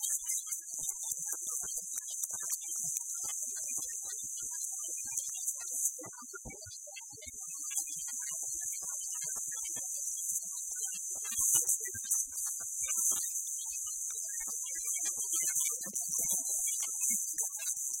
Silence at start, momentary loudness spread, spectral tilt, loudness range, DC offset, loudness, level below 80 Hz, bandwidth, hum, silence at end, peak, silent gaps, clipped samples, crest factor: 0 s; 7 LU; 1 dB/octave; 6 LU; under 0.1%; -33 LUFS; -72 dBFS; 16.5 kHz; none; 0 s; -14 dBFS; none; under 0.1%; 22 dB